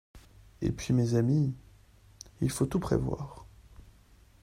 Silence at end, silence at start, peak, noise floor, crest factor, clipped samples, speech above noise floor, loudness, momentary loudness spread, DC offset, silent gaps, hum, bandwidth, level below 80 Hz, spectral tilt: 0.5 s; 0.15 s; -14 dBFS; -59 dBFS; 18 dB; under 0.1%; 30 dB; -30 LUFS; 21 LU; under 0.1%; none; none; 14.5 kHz; -50 dBFS; -7 dB/octave